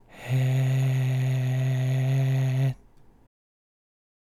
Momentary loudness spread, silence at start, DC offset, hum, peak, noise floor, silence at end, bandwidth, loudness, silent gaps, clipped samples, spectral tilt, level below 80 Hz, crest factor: 4 LU; 0.15 s; under 0.1%; none; -16 dBFS; -53 dBFS; 1.5 s; 13.5 kHz; -25 LUFS; none; under 0.1%; -7.5 dB/octave; -58 dBFS; 10 dB